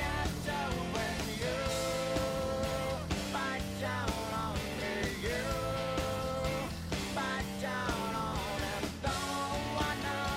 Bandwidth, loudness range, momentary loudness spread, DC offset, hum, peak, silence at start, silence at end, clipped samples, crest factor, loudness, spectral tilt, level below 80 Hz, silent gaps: 16 kHz; 1 LU; 2 LU; under 0.1%; none; -20 dBFS; 0 s; 0 s; under 0.1%; 14 dB; -35 LUFS; -4.5 dB/octave; -46 dBFS; none